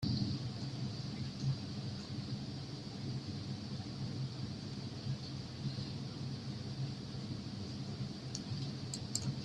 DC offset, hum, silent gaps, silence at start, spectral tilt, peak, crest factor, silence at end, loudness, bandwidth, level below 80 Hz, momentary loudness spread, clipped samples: under 0.1%; none; none; 0 s; -5.5 dB/octave; -20 dBFS; 22 dB; 0 s; -42 LUFS; 12.5 kHz; -62 dBFS; 5 LU; under 0.1%